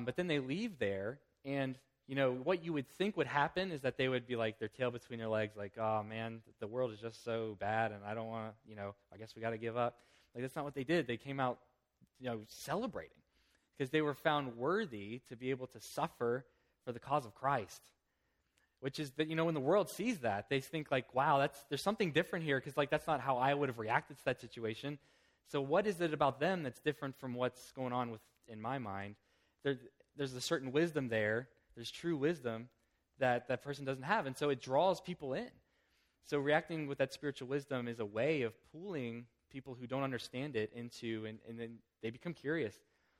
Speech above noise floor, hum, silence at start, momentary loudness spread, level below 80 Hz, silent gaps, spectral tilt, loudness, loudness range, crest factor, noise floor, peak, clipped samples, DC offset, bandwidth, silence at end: 44 dB; none; 0 s; 14 LU; -74 dBFS; none; -5.5 dB/octave; -38 LUFS; 6 LU; 24 dB; -82 dBFS; -16 dBFS; under 0.1%; under 0.1%; 16 kHz; 0.4 s